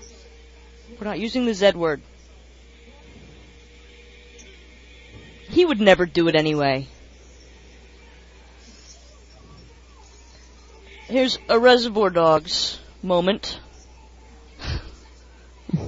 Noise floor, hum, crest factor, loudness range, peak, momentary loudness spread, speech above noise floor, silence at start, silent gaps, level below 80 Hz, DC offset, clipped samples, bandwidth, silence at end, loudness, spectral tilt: -47 dBFS; none; 24 dB; 9 LU; 0 dBFS; 19 LU; 28 dB; 0 s; none; -46 dBFS; under 0.1%; under 0.1%; 7.8 kHz; 0 s; -20 LUFS; -5 dB/octave